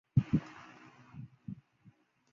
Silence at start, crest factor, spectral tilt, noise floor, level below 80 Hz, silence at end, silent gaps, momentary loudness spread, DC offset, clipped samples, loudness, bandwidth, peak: 0.15 s; 24 dB; -9 dB/octave; -65 dBFS; -58 dBFS; 0.8 s; none; 23 LU; under 0.1%; under 0.1%; -36 LUFS; 7 kHz; -14 dBFS